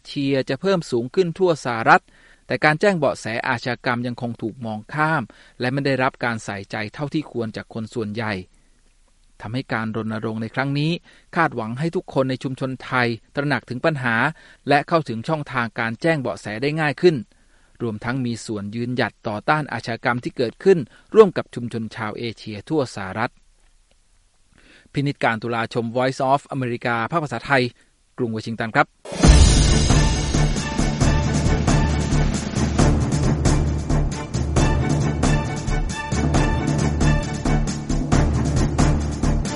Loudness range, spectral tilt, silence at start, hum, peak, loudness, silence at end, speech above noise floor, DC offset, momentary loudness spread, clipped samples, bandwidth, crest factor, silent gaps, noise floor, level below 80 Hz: 8 LU; -5.5 dB/octave; 0.05 s; none; 0 dBFS; -21 LUFS; 0 s; 36 dB; under 0.1%; 10 LU; under 0.1%; 11.5 kHz; 20 dB; none; -58 dBFS; -28 dBFS